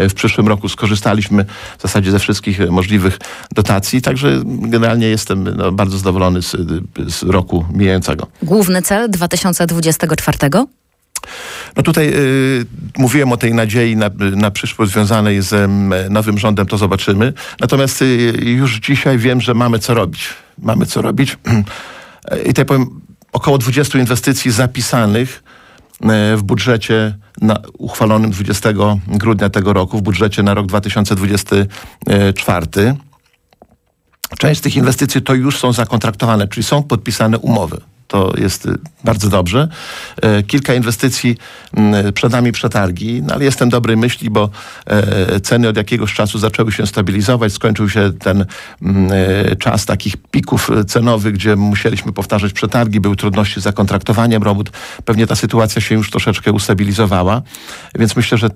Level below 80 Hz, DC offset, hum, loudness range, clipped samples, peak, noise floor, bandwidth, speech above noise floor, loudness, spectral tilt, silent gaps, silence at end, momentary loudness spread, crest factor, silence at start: -38 dBFS; under 0.1%; none; 2 LU; under 0.1%; -2 dBFS; -57 dBFS; 16 kHz; 44 dB; -14 LUFS; -5.5 dB/octave; none; 0 s; 7 LU; 12 dB; 0 s